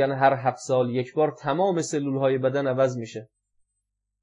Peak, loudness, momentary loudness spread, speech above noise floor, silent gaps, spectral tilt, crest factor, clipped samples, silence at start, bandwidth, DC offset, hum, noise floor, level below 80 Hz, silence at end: -6 dBFS; -24 LUFS; 5 LU; 57 dB; none; -6 dB/octave; 18 dB; under 0.1%; 0 s; 10.5 kHz; under 0.1%; 50 Hz at -70 dBFS; -81 dBFS; -78 dBFS; 1 s